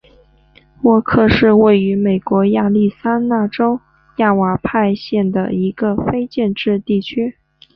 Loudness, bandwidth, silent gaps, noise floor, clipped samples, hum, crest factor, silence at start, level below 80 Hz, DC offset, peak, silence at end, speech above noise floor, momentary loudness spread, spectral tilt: -15 LUFS; 5.8 kHz; none; -50 dBFS; under 0.1%; none; 14 dB; 0.85 s; -42 dBFS; under 0.1%; -2 dBFS; 0.45 s; 36 dB; 8 LU; -9.5 dB/octave